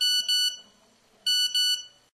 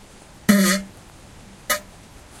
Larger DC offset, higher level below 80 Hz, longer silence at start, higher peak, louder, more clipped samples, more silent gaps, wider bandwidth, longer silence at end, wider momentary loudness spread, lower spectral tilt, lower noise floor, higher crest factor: neither; second, -78 dBFS vs -50 dBFS; second, 0 s vs 0.5 s; second, -16 dBFS vs -2 dBFS; second, -23 LUFS vs -20 LUFS; neither; neither; second, 12.5 kHz vs 16 kHz; second, 0.25 s vs 0.6 s; second, 9 LU vs 19 LU; second, 4.5 dB/octave vs -4 dB/octave; first, -61 dBFS vs -44 dBFS; second, 12 dB vs 22 dB